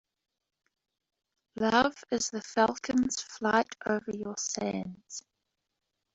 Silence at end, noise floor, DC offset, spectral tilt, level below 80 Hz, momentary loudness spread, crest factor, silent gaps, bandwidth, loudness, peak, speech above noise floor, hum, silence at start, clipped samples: 0.95 s; -84 dBFS; under 0.1%; -3 dB/octave; -66 dBFS; 14 LU; 24 dB; none; 8.2 kHz; -30 LUFS; -10 dBFS; 53 dB; none; 1.55 s; under 0.1%